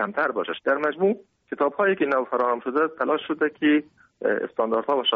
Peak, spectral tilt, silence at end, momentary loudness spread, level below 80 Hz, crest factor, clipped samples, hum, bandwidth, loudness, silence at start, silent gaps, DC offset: -8 dBFS; -2 dB/octave; 0 s; 4 LU; -72 dBFS; 14 dB; under 0.1%; none; 5.2 kHz; -24 LUFS; 0 s; none; under 0.1%